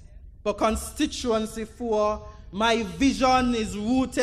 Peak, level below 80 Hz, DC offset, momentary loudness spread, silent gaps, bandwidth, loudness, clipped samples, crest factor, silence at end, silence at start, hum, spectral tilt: -8 dBFS; -42 dBFS; under 0.1%; 11 LU; none; 15 kHz; -25 LUFS; under 0.1%; 16 dB; 0 s; 0 s; none; -4.5 dB/octave